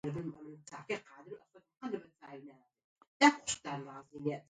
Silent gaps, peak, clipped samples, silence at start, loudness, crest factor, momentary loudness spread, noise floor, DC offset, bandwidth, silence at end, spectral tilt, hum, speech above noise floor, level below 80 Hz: 2.84-2.96 s, 3.07-3.20 s; -12 dBFS; under 0.1%; 0.05 s; -35 LUFS; 26 dB; 25 LU; -55 dBFS; under 0.1%; 9.4 kHz; 0.1 s; -3.5 dB/octave; none; 13 dB; -74 dBFS